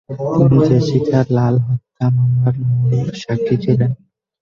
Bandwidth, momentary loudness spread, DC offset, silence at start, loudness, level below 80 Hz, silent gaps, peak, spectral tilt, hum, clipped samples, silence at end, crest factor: 7 kHz; 8 LU; under 0.1%; 0.1 s; -16 LUFS; -46 dBFS; none; -2 dBFS; -9 dB/octave; none; under 0.1%; 0.45 s; 14 dB